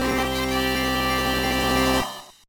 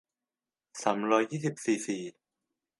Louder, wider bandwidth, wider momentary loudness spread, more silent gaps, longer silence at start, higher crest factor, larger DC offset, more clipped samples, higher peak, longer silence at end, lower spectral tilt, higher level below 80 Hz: first, -22 LUFS vs -31 LUFS; first, 19.5 kHz vs 11.5 kHz; second, 3 LU vs 13 LU; neither; second, 0 s vs 0.75 s; second, 14 dB vs 22 dB; neither; neither; about the same, -10 dBFS vs -10 dBFS; second, 0.15 s vs 0.7 s; about the same, -4 dB/octave vs -5 dB/octave; first, -36 dBFS vs -84 dBFS